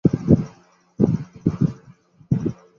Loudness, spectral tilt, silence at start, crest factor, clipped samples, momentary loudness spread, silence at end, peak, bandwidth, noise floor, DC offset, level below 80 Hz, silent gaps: -22 LUFS; -10.5 dB/octave; 0.05 s; 20 dB; under 0.1%; 8 LU; 0.25 s; -2 dBFS; 6.8 kHz; -52 dBFS; under 0.1%; -42 dBFS; none